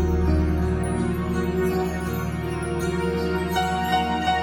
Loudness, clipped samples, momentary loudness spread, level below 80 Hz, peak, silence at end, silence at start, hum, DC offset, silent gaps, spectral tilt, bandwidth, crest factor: -24 LUFS; under 0.1%; 5 LU; -30 dBFS; -10 dBFS; 0 s; 0 s; none; under 0.1%; none; -6.5 dB/octave; 18.5 kHz; 14 dB